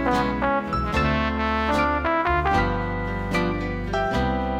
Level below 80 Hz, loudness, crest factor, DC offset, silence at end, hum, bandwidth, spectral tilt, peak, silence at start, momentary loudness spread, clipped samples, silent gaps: -32 dBFS; -23 LUFS; 14 dB; under 0.1%; 0 s; none; 15 kHz; -6.5 dB/octave; -8 dBFS; 0 s; 5 LU; under 0.1%; none